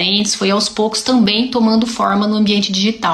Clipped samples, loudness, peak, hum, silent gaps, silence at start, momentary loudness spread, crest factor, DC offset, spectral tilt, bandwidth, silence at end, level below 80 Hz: under 0.1%; -14 LUFS; -2 dBFS; none; none; 0 s; 3 LU; 14 dB; under 0.1%; -4 dB/octave; 12.5 kHz; 0 s; -50 dBFS